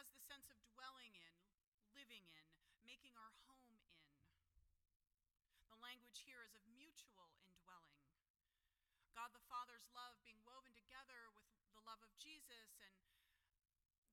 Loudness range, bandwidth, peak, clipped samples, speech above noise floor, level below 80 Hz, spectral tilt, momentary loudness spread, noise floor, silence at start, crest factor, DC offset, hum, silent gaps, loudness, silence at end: 8 LU; 17.5 kHz; -40 dBFS; under 0.1%; over 27 dB; -88 dBFS; -1 dB/octave; 10 LU; under -90 dBFS; 0 s; 24 dB; under 0.1%; none; 1.67-1.78 s, 4.96-5.00 s, 8.30-8.34 s, 13.98-14.02 s; -62 LUFS; 0 s